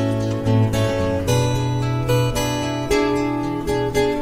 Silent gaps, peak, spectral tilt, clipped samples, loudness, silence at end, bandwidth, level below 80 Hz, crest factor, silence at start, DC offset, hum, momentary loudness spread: none; -4 dBFS; -6 dB/octave; under 0.1%; -20 LUFS; 0 s; 16 kHz; -36 dBFS; 14 dB; 0 s; under 0.1%; none; 3 LU